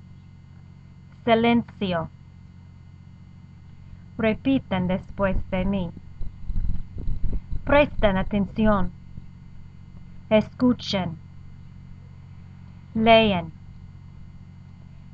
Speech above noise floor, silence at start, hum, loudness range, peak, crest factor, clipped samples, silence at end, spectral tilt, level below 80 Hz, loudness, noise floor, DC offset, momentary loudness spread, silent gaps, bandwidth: 25 dB; 1.2 s; none; 4 LU; -4 dBFS; 22 dB; under 0.1%; 0.05 s; -7.5 dB/octave; -34 dBFS; -24 LUFS; -46 dBFS; under 0.1%; 26 LU; none; 7 kHz